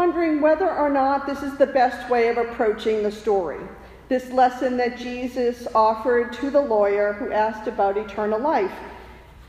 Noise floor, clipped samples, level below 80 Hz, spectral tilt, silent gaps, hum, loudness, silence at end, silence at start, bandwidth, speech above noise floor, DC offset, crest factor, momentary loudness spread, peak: -43 dBFS; under 0.1%; -50 dBFS; -5.5 dB/octave; none; none; -22 LUFS; 0.05 s; 0 s; 15 kHz; 22 dB; under 0.1%; 16 dB; 8 LU; -6 dBFS